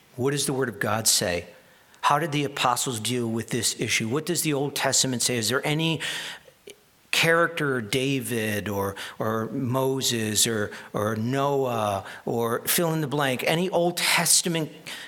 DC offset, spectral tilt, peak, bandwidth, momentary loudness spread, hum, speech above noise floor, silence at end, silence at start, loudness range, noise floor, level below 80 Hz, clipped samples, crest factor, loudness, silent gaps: under 0.1%; -3 dB/octave; -4 dBFS; 19 kHz; 9 LU; none; 25 dB; 0 s; 0.15 s; 2 LU; -50 dBFS; -64 dBFS; under 0.1%; 22 dB; -24 LUFS; none